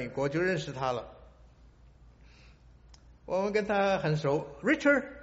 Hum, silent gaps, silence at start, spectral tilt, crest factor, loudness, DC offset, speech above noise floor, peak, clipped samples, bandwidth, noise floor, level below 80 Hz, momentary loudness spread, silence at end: none; none; 0 s; -5 dB/octave; 20 dB; -29 LUFS; under 0.1%; 28 dB; -12 dBFS; under 0.1%; 8 kHz; -57 dBFS; -58 dBFS; 8 LU; 0 s